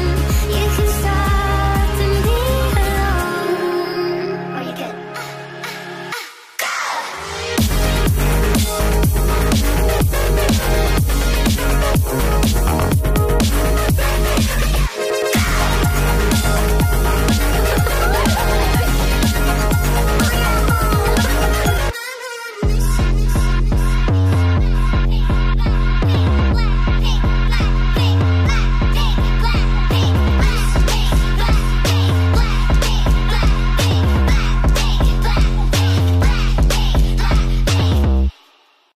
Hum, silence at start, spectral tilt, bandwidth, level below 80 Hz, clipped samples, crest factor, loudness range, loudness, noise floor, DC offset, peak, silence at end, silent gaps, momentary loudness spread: none; 0 s; -5 dB/octave; 15.5 kHz; -18 dBFS; under 0.1%; 10 dB; 3 LU; -17 LUFS; -53 dBFS; under 0.1%; -4 dBFS; 0.65 s; none; 5 LU